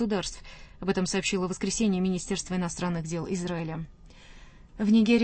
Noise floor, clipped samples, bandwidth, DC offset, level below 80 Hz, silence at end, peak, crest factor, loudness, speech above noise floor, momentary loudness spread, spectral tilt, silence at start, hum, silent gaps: -49 dBFS; under 0.1%; 8.8 kHz; under 0.1%; -50 dBFS; 0 s; -10 dBFS; 18 dB; -29 LUFS; 22 dB; 12 LU; -5 dB/octave; 0 s; none; none